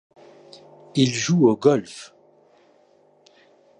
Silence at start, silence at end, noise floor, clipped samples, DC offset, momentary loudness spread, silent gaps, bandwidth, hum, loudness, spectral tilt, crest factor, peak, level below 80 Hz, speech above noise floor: 0.95 s; 1.75 s; -58 dBFS; under 0.1%; under 0.1%; 19 LU; none; 10.5 kHz; 50 Hz at -50 dBFS; -20 LUFS; -5.5 dB/octave; 20 dB; -4 dBFS; -68 dBFS; 38 dB